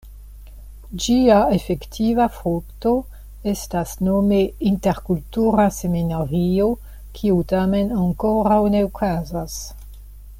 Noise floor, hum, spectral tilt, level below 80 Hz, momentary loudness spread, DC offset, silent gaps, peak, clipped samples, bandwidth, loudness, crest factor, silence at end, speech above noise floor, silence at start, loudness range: -39 dBFS; none; -6.5 dB/octave; -36 dBFS; 11 LU; under 0.1%; none; -2 dBFS; under 0.1%; 16.5 kHz; -20 LUFS; 16 dB; 0 s; 20 dB; 0.05 s; 1 LU